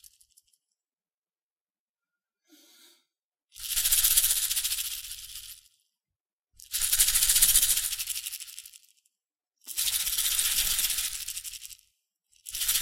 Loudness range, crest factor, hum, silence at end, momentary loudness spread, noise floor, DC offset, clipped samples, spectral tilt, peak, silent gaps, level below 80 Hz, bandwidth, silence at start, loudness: 4 LU; 30 dB; none; 0 s; 21 LU; under -90 dBFS; under 0.1%; under 0.1%; 3 dB/octave; -2 dBFS; none; -50 dBFS; 17 kHz; 3.6 s; -24 LUFS